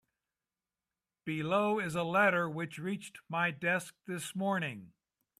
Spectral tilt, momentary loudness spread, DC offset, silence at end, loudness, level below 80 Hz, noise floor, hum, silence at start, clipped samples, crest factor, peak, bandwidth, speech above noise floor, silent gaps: -5.5 dB/octave; 13 LU; under 0.1%; 0.5 s; -33 LUFS; -76 dBFS; under -90 dBFS; none; 1.25 s; under 0.1%; 20 dB; -16 dBFS; 15 kHz; over 57 dB; none